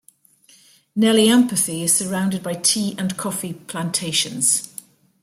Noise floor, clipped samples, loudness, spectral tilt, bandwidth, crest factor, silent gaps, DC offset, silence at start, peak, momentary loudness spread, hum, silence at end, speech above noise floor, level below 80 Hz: -54 dBFS; under 0.1%; -19 LUFS; -3 dB/octave; 16 kHz; 18 dB; none; under 0.1%; 0.95 s; -4 dBFS; 13 LU; none; 0.55 s; 35 dB; -64 dBFS